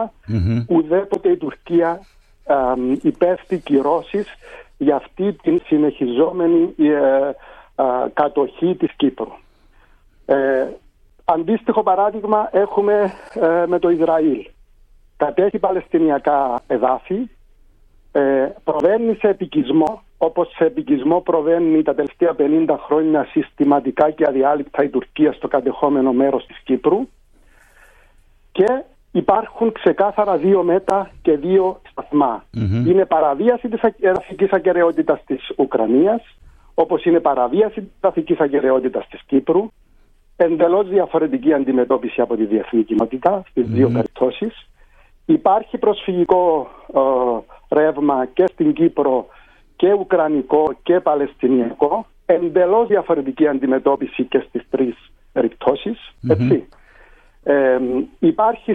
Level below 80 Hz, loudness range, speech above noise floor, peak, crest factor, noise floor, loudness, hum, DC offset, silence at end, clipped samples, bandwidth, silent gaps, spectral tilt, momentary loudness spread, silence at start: -48 dBFS; 3 LU; 34 dB; -2 dBFS; 16 dB; -51 dBFS; -18 LUFS; none; under 0.1%; 0 s; under 0.1%; 4.6 kHz; none; -9 dB/octave; 7 LU; 0 s